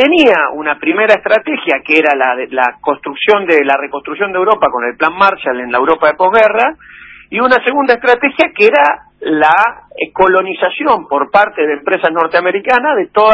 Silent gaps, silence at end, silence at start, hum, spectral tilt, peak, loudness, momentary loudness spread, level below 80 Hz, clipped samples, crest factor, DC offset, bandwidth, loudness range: none; 0 s; 0 s; none; -5 dB/octave; 0 dBFS; -11 LUFS; 7 LU; -52 dBFS; 0.3%; 12 dB; under 0.1%; 8 kHz; 2 LU